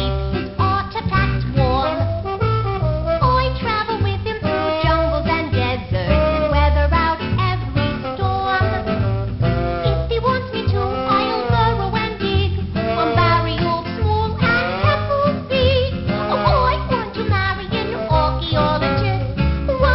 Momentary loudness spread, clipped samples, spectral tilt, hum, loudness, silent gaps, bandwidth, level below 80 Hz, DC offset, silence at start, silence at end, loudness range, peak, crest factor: 5 LU; under 0.1%; -11.5 dB/octave; none; -19 LUFS; none; 5.8 kHz; -26 dBFS; 0.4%; 0 s; 0 s; 2 LU; 0 dBFS; 18 dB